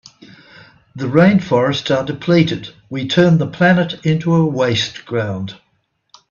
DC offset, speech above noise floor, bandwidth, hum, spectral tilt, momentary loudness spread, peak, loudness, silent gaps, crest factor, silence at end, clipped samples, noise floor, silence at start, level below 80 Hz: under 0.1%; 50 dB; 7.2 kHz; none; -6.5 dB/octave; 13 LU; 0 dBFS; -16 LUFS; none; 16 dB; 0.75 s; under 0.1%; -65 dBFS; 0.95 s; -52 dBFS